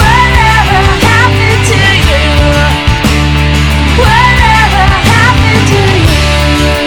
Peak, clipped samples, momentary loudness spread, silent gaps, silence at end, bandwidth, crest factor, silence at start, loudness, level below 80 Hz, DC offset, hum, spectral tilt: 0 dBFS; 3%; 3 LU; none; 0 s; 18 kHz; 6 dB; 0 s; -7 LUFS; -12 dBFS; under 0.1%; none; -5 dB/octave